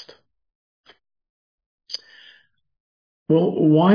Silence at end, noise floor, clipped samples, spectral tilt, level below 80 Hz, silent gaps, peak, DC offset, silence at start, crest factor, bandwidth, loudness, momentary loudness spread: 0 s; -55 dBFS; under 0.1%; -8 dB/octave; -70 dBFS; 2.80-3.26 s; -4 dBFS; under 0.1%; 1.9 s; 18 dB; 5.4 kHz; -20 LUFS; 16 LU